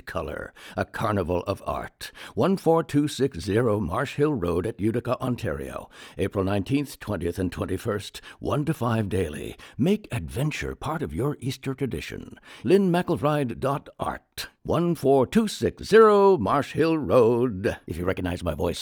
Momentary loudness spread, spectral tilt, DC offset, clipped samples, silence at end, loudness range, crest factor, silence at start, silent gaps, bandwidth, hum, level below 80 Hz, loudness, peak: 14 LU; -6.5 dB/octave; under 0.1%; under 0.1%; 0 s; 8 LU; 20 dB; 0.05 s; none; over 20 kHz; none; -50 dBFS; -25 LUFS; -6 dBFS